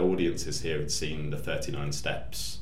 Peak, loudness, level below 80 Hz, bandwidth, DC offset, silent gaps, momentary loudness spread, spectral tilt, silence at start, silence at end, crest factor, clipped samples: -14 dBFS; -32 LUFS; -44 dBFS; 16 kHz; 2%; none; 5 LU; -4 dB/octave; 0 s; 0 s; 16 dB; under 0.1%